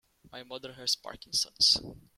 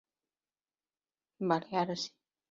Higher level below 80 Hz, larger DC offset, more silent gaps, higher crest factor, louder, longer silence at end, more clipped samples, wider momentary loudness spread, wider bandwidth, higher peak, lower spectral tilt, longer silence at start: first, -62 dBFS vs -80 dBFS; neither; neither; about the same, 22 dB vs 22 dB; first, -27 LUFS vs -34 LUFS; second, 0.2 s vs 0.45 s; neither; first, 19 LU vs 8 LU; first, 16.5 kHz vs 7.2 kHz; first, -10 dBFS vs -16 dBFS; second, -0.5 dB/octave vs -4 dB/octave; second, 0.35 s vs 1.4 s